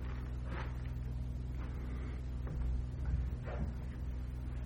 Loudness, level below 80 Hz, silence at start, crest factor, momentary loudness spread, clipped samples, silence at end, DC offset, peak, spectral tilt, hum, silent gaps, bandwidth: -42 LUFS; -40 dBFS; 0 s; 14 dB; 4 LU; under 0.1%; 0 s; under 0.1%; -24 dBFS; -8 dB/octave; none; none; 6.6 kHz